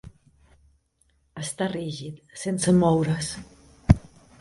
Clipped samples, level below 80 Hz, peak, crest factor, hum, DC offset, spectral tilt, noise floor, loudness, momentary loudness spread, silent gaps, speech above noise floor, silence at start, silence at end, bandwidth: under 0.1%; -38 dBFS; 0 dBFS; 26 dB; none; under 0.1%; -6 dB/octave; -67 dBFS; -25 LUFS; 17 LU; none; 42 dB; 0.05 s; 0.4 s; 11.5 kHz